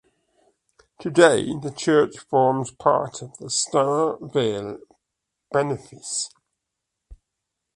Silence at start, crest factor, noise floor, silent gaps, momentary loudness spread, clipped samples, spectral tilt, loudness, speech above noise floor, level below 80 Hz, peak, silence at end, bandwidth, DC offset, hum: 1 s; 22 dB; -82 dBFS; none; 16 LU; under 0.1%; -4 dB/octave; -22 LUFS; 60 dB; -60 dBFS; -2 dBFS; 0.6 s; 11.5 kHz; under 0.1%; none